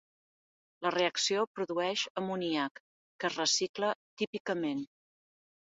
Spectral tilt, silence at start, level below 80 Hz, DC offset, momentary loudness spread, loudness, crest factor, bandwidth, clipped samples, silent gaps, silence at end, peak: -2 dB/octave; 0.8 s; -80 dBFS; under 0.1%; 8 LU; -33 LUFS; 20 dB; 7.6 kHz; under 0.1%; 1.47-1.55 s, 2.10-2.15 s, 2.71-3.19 s, 3.69-3.74 s, 3.95-4.17 s, 4.27-4.33 s, 4.40-4.45 s; 0.95 s; -16 dBFS